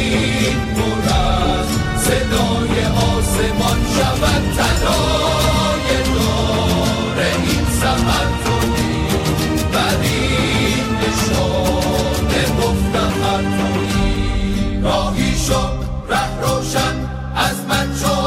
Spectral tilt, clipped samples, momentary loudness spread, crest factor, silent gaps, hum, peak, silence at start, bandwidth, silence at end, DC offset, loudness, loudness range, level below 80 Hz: -4.5 dB/octave; under 0.1%; 3 LU; 14 dB; none; none; -4 dBFS; 0 s; 16 kHz; 0 s; under 0.1%; -17 LUFS; 2 LU; -24 dBFS